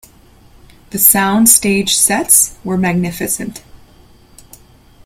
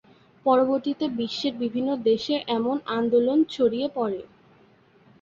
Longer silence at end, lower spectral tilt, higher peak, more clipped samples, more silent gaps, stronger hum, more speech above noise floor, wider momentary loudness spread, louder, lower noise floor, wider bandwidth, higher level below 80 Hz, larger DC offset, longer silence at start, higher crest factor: first, 1.3 s vs 1 s; second, -2.5 dB/octave vs -6 dB/octave; first, 0 dBFS vs -8 dBFS; first, 0.2% vs under 0.1%; neither; neither; about the same, 32 dB vs 34 dB; first, 11 LU vs 7 LU; first, -11 LUFS vs -24 LUFS; second, -44 dBFS vs -57 dBFS; first, over 20 kHz vs 7.4 kHz; first, -44 dBFS vs -66 dBFS; neither; first, 0.95 s vs 0.45 s; about the same, 16 dB vs 16 dB